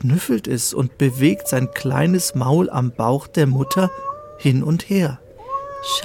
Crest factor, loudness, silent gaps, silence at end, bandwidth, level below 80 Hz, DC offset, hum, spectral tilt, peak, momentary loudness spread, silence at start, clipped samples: 16 dB; -19 LUFS; none; 0 s; 18 kHz; -52 dBFS; under 0.1%; none; -5.5 dB/octave; -4 dBFS; 10 LU; 0 s; under 0.1%